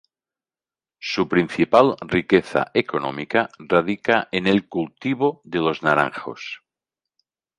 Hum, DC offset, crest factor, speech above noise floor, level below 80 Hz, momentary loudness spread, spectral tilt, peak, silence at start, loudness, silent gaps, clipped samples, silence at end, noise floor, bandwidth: none; under 0.1%; 20 dB; over 69 dB; -56 dBFS; 11 LU; -6.5 dB/octave; -2 dBFS; 1 s; -21 LUFS; none; under 0.1%; 1 s; under -90 dBFS; 10.5 kHz